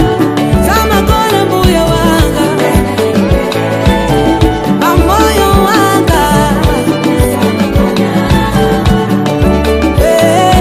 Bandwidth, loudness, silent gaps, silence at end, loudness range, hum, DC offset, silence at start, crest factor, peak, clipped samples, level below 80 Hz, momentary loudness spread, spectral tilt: 16 kHz; -9 LUFS; none; 0 s; 1 LU; none; under 0.1%; 0 s; 8 dB; 0 dBFS; 0.6%; -18 dBFS; 3 LU; -5.5 dB/octave